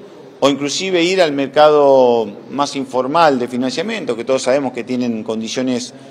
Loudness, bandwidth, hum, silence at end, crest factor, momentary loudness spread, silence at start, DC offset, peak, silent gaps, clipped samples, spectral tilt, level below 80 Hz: -16 LUFS; 12 kHz; none; 0 s; 16 dB; 10 LU; 0 s; under 0.1%; 0 dBFS; none; under 0.1%; -4 dB/octave; -64 dBFS